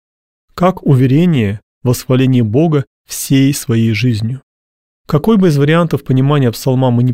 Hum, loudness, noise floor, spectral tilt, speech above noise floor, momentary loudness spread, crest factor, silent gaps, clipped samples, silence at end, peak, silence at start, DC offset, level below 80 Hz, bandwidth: none; -13 LUFS; under -90 dBFS; -7 dB/octave; over 79 dB; 9 LU; 12 dB; 1.63-1.81 s, 2.87-3.05 s, 4.43-5.05 s; under 0.1%; 0 s; 0 dBFS; 0.55 s; 0.6%; -44 dBFS; 16.5 kHz